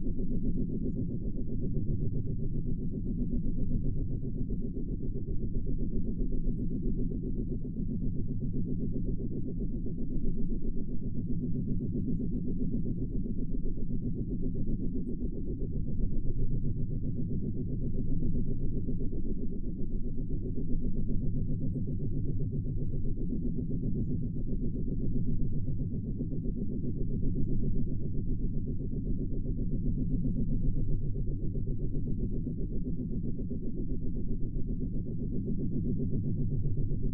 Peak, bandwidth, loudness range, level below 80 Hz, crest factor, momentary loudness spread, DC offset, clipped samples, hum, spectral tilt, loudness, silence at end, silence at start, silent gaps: -16 dBFS; 0.8 kHz; 2 LU; -34 dBFS; 14 dB; 4 LU; 1%; under 0.1%; none; -15.5 dB/octave; -35 LUFS; 0 s; 0 s; none